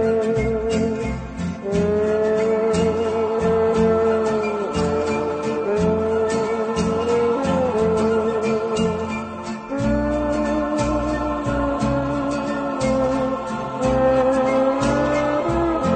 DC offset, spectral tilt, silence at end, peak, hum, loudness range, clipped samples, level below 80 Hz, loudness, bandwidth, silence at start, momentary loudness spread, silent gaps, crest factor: under 0.1%; -6.5 dB/octave; 0 s; -6 dBFS; none; 3 LU; under 0.1%; -38 dBFS; -21 LUFS; 9 kHz; 0 s; 6 LU; none; 14 dB